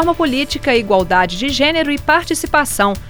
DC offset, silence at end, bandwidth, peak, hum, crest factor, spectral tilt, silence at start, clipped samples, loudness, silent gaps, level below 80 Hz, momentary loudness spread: under 0.1%; 0 s; over 20 kHz; 0 dBFS; none; 14 dB; -3.5 dB/octave; 0 s; under 0.1%; -15 LUFS; none; -34 dBFS; 3 LU